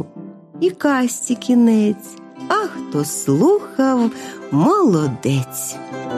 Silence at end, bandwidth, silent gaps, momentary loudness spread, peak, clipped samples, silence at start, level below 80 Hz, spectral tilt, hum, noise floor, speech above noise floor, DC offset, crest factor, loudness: 0 s; 15.5 kHz; none; 16 LU; -4 dBFS; under 0.1%; 0 s; -62 dBFS; -5.5 dB/octave; none; -37 dBFS; 19 dB; under 0.1%; 14 dB; -18 LUFS